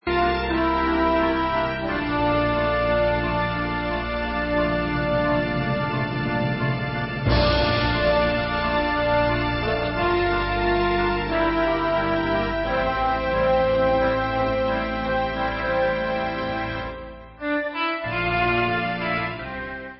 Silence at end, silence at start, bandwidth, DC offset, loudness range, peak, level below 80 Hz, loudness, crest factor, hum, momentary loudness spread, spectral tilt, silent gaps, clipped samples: 0 s; 0.05 s; 5.8 kHz; under 0.1%; 3 LU; -8 dBFS; -36 dBFS; -23 LUFS; 14 dB; none; 6 LU; -10.5 dB/octave; none; under 0.1%